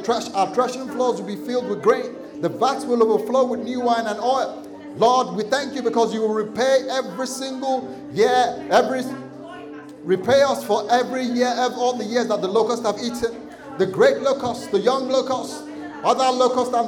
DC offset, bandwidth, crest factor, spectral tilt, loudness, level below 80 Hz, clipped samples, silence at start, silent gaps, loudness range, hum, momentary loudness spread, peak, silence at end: under 0.1%; 18 kHz; 14 dB; -4 dB/octave; -21 LUFS; -62 dBFS; under 0.1%; 0 s; none; 2 LU; none; 12 LU; -6 dBFS; 0 s